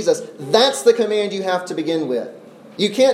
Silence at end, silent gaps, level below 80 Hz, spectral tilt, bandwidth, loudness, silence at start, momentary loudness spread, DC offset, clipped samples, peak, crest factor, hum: 0 s; none; -74 dBFS; -3.5 dB/octave; 15 kHz; -18 LUFS; 0 s; 10 LU; under 0.1%; under 0.1%; -2 dBFS; 18 dB; none